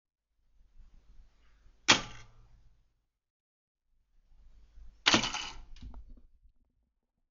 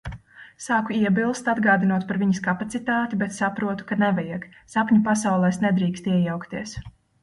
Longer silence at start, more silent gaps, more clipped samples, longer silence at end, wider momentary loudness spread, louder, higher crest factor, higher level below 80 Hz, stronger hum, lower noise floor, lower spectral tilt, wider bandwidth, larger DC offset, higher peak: first, 0.8 s vs 0.05 s; first, 3.30-3.75 s vs none; neither; first, 1.15 s vs 0.35 s; first, 27 LU vs 13 LU; second, -28 LUFS vs -23 LUFS; first, 32 dB vs 16 dB; about the same, -56 dBFS vs -52 dBFS; neither; first, -80 dBFS vs -42 dBFS; second, -0.5 dB/octave vs -6 dB/octave; second, 7.6 kHz vs 11.5 kHz; neither; about the same, -6 dBFS vs -6 dBFS